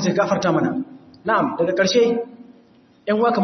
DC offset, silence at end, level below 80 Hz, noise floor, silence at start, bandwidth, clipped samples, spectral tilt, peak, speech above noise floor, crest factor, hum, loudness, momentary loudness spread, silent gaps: under 0.1%; 0 s; -64 dBFS; -53 dBFS; 0 s; 6.4 kHz; under 0.1%; -5 dB/octave; -6 dBFS; 34 dB; 14 dB; none; -20 LUFS; 14 LU; none